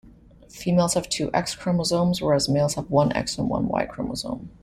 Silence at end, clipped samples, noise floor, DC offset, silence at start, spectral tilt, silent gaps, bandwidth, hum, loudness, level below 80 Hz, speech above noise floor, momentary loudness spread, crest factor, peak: 0.15 s; under 0.1%; -49 dBFS; under 0.1%; 0.05 s; -5 dB/octave; none; 14 kHz; none; -24 LUFS; -48 dBFS; 26 dB; 8 LU; 16 dB; -6 dBFS